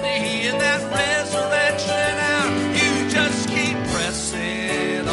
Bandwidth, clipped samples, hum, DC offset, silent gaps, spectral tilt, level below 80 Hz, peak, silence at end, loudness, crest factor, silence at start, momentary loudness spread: 11.5 kHz; under 0.1%; none; under 0.1%; none; -3 dB/octave; -46 dBFS; -6 dBFS; 0 s; -20 LUFS; 16 dB; 0 s; 4 LU